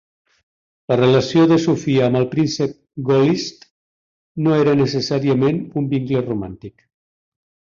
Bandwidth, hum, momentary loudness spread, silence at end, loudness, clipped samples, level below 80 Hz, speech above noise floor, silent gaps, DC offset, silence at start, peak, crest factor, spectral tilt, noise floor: 7.6 kHz; none; 11 LU; 1.1 s; -18 LUFS; under 0.1%; -54 dBFS; over 73 dB; 3.71-4.35 s; under 0.1%; 0.9 s; -2 dBFS; 16 dB; -7 dB/octave; under -90 dBFS